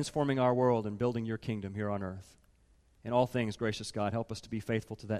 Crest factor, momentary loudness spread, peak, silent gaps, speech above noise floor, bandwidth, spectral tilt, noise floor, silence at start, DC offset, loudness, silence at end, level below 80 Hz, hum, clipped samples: 18 dB; 10 LU; -16 dBFS; none; 33 dB; 14 kHz; -6.5 dB/octave; -66 dBFS; 0 s; under 0.1%; -33 LUFS; 0 s; -62 dBFS; none; under 0.1%